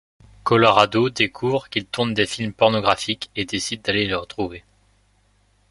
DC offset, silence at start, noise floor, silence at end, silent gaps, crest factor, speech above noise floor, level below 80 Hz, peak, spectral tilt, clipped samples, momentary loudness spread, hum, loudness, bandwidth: under 0.1%; 0.45 s; -61 dBFS; 1.1 s; none; 20 dB; 40 dB; -52 dBFS; -2 dBFS; -4.5 dB/octave; under 0.1%; 11 LU; 50 Hz at -50 dBFS; -20 LUFS; 11.5 kHz